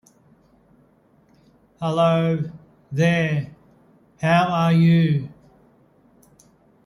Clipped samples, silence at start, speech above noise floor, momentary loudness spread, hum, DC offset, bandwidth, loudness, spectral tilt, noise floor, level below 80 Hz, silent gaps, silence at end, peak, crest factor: under 0.1%; 1.8 s; 39 dB; 14 LU; none; under 0.1%; 11 kHz; -20 LUFS; -7.5 dB/octave; -58 dBFS; -60 dBFS; none; 1.55 s; -6 dBFS; 18 dB